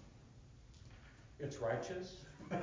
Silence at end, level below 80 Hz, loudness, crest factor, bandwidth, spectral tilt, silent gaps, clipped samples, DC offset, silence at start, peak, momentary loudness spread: 0 s; -64 dBFS; -44 LUFS; 20 dB; 7.6 kHz; -6 dB/octave; none; under 0.1%; under 0.1%; 0 s; -26 dBFS; 21 LU